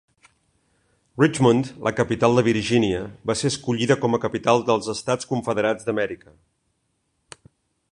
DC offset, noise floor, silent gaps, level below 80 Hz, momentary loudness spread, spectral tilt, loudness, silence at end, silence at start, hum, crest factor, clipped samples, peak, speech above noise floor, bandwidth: under 0.1%; -72 dBFS; none; -54 dBFS; 8 LU; -5.5 dB/octave; -22 LUFS; 1.75 s; 1.15 s; none; 20 dB; under 0.1%; -2 dBFS; 51 dB; 11 kHz